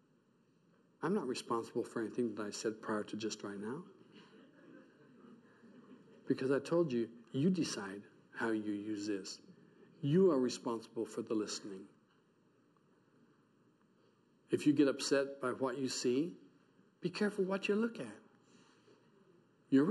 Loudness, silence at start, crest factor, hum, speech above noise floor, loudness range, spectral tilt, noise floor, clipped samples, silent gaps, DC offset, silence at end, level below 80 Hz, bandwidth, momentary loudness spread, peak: -37 LUFS; 1 s; 20 dB; none; 36 dB; 9 LU; -5.5 dB/octave; -72 dBFS; under 0.1%; none; under 0.1%; 0 s; -88 dBFS; 12.5 kHz; 13 LU; -20 dBFS